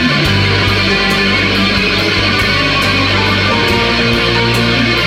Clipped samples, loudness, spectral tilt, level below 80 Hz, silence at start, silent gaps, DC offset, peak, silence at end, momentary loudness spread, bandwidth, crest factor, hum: under 0.1%; -11 LUFS; -4.5 dB/octave; -28 dBFS; 0 s; none; under 0.1%; 0 dBFS; 0 s; 0 LU; 16 kHz; 12 dB; none